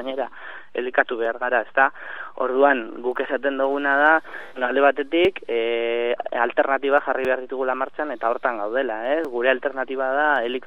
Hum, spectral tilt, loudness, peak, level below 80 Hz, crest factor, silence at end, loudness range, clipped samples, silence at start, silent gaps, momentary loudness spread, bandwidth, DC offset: none; -5.5 dB/octave; -22 LUFS; -2 dBFS; -62 dBFS; 20 dB; 0 s; 2 LU; under 0.1%; 0 s; none; 9 LU; 6 kHz; 0.9%